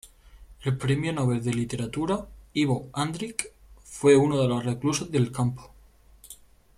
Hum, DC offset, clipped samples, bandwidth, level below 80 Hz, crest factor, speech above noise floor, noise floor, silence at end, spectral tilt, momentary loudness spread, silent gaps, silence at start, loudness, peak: none; under 0.1%; under 0.1%; 14.5 kHz; -52 dBFS; 20 dB; 30 dB; -55 dBFS; 0.45 s; -6 dB/octave; 18 LU; none; 0.05 s; -26 LUFS; -8 dBFS